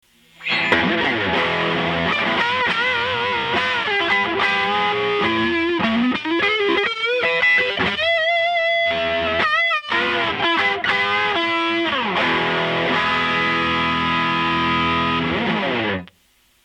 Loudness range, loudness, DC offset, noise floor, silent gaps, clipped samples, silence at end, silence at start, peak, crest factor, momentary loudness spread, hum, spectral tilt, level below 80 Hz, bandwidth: 1 LU; -18 LUFS; under 0.1%; -59 dBFS; none; under 0.1%; 0.6 s; 0.4 s; -2 dBFS; 18 dB; 3 LU; none; -5 dB/octave; -50 dBFS; 9.8 kHz